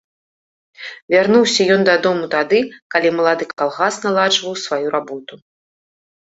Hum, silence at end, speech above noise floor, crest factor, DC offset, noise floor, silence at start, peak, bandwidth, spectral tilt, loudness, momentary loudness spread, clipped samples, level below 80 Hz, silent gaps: none; 0.95 s; over 74 dB; 16 dB; under 0.1%; under -90 dBFS; 0.8 s; -2 dBFS; 8.2 kHz; -3.5 dB/octave; -16 LUFS; 13 LU; under 0.1%; -64 dBFS; 1.02-1.08 s, 2.82-2.90 s, 3.53-3.57 s